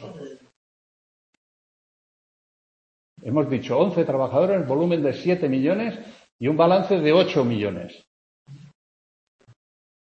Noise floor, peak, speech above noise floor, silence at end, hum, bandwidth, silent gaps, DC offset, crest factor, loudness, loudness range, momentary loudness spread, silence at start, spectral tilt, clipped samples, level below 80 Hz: under -90 dBFS; -4 dBFS; over 69 dB; 1.55 s; none; 8 kHz; 0.56-3.16 s, 6.32-6.39 s, 8.07-8.46 s; under 0.1%; 20 dB; -21 LUFS; 6 LU; 20 LU; 0 s; -8 dB/octave; under 0.1%; -66 dBFS